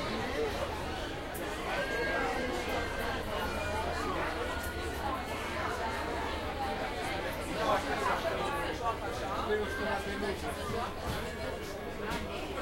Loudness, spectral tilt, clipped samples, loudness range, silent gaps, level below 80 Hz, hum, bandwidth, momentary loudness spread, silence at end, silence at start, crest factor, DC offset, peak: -35 LUFS; -4.5 dB/octave; under 0.1%; 2 LU; none; -46 dBFS; none; 16 kHz; 5 LU; 0 s; 0 s; 16 dB; under 0.1%; -18 dBFS